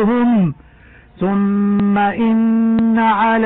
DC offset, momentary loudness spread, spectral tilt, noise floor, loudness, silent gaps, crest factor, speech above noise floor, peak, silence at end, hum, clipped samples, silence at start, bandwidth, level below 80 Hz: under 0.1%; 4 LU; -11.5 dB/octave; -44 dBFS; -15 LUFS; none; 8 dB; 30 dB; -6 dBFS; 0 s; none; under 0.1%; 0 s; 4.1 kHz; -46 dBFS